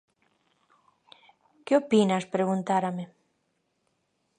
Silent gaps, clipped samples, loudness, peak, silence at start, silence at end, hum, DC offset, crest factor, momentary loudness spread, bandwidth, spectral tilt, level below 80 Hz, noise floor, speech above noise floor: none; under 0.1%; -26 LUFS; -10 dBFS; 1.65 s; 1.35 s; none; under 0.1%; 20 dB; 17 LU; 9.8 kHz; -6.5 dB/octave; -78 dBFS; -75 dBFS; 50 dB